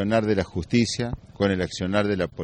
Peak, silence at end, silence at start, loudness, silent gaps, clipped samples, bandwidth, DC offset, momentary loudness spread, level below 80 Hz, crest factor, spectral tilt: -8 dBFS; 0 s; 0 s; -24 LUFS; none; under 0.1%; 9.8 kHz; under 0.1%; 4 LU; -46 dBFS; 16 dB; -5.5 dB/octave